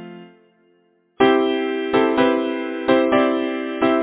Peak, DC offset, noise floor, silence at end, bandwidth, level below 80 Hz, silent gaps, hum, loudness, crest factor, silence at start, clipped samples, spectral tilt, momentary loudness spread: -2 dBFS; under 0.1%; -60 dBFS; 0 s; 4 kHz; -56 dBFS; none; none; -19 LUFS; 18 dB; 0 s; under 0.1%; -9 dB/octave; 8 LU